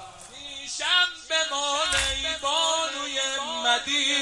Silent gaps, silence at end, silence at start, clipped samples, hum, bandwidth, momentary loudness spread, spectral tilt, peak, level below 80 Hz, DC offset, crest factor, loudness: none; 0 s; 0 s; under 0.1%; none; 11.5 kHz; 12 LU; 0 dB/octave; -8 dBFS; -50 dBFS; under 0.1%; 18 dB; -24 LUFS